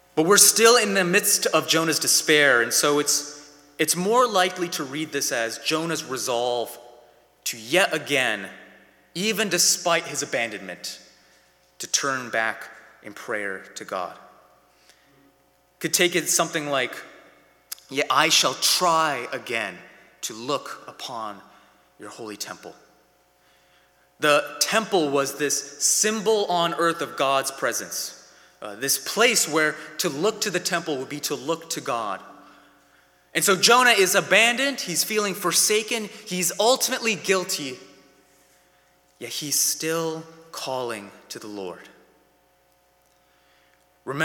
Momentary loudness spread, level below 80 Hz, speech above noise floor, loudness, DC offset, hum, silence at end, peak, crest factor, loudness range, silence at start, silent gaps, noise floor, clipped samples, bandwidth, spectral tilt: 18 LU; -74 dBFS; 39 dB; -21 LUFS; under 0.1%; none; 0 s; 0 dBFS; 24 dB; 13 LU; 0.15 s; none; -62 dBFS; under 0.1%; 19 kHz; -1.5 dB/octave